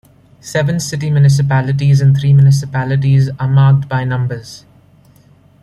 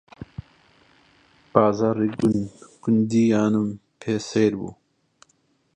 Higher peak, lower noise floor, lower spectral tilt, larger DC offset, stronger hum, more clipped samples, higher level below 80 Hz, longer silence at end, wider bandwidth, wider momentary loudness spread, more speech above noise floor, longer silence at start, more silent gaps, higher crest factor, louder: about the same, -2 dBFS vs -2 dBFS; second, -46 dBFS vs -65 dBFS; about the same, -7 dB/octave vs -7 dB/octave; neither; neither; neither; first, -46 dBFS vs -56 dBFS; about the same, 1.05 s vs 1.05 s; first, 11.5 kHz vs 9.6 kHz; second, 9 LU vs 19 LU; second, 35 dB vs 45 dB; first, 0.45 s vs 0.2 s; neither; second, 10 dB vs 22 dB; first, -13 LUFS vs -22 LUFS